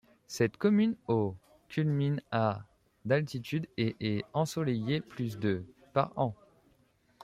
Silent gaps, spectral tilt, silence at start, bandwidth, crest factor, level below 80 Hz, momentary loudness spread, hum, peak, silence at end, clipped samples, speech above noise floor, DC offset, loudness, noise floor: none; -7 dB/octave; 0.3 s; 15 kHz; 20 dB; -68 dBFS; 9 LU; none; -12 dBFS; 0.9 s; under 0.1%; 38 dB; under 0.1%; -32 LUFS; -68 dBFS